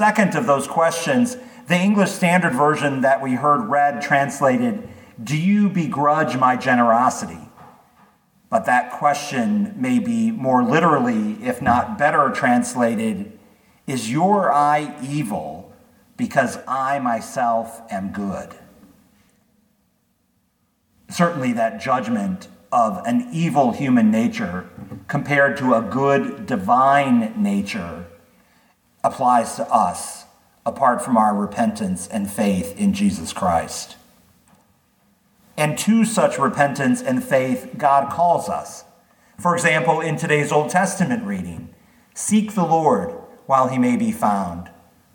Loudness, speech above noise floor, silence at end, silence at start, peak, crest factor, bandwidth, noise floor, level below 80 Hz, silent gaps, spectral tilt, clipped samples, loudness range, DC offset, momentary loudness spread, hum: -19 LUFS; 47 dB; 0.45 s; 0 s; -2 dBFS; 18 dB; 19 kHz; -66 dBFS; -58 dBFS; none; -5.5 dB/octave; under 0.1%; 5 LU; under 0.1%; 13 LU; none